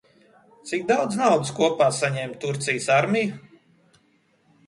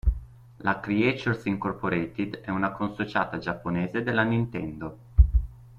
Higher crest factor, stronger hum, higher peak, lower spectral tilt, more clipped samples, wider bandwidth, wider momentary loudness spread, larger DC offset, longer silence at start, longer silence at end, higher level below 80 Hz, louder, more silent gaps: about the same, 20 dB vs 22 dB; neither; about the same, -4 dBFS vs -4 dBFS; second, -4.5 dB/octave vs -8 dB/octave; neither; first, 11.5 kHz vs 6.8 kHz; about the same, 10 LU vs 8 LU; neither; first, 0.65 s vs 0.05 s; first, 1.3 s vs 0 s; second, -68 dBFS vs -30 dBFS; first, -23 LUFS vs -27 LUFS; neither